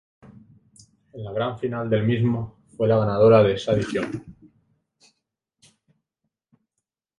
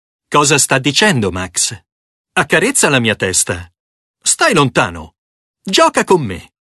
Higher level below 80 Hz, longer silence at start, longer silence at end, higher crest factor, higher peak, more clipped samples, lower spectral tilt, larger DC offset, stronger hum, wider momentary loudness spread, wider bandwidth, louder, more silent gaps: second, -54 dBFS vs -42 dBFS; first, 1.15 s vs 0.3 s; first, 2.85 s vs 0.35 s; first, 22 dB vs 16 dB; second, -4 dBFS vs 0 dBFS; neither; first, -7.5 dB/octave vs -3 dB/octave; neither; neither; first, 16 LU vs 9 LU; second, 11 kHz vs 12.5 kHz; second, -22 LUFS vs -13 LUFS; second, none vs 1.92-2.24 s, 3.80-4.14 s, 5.18-5.54 s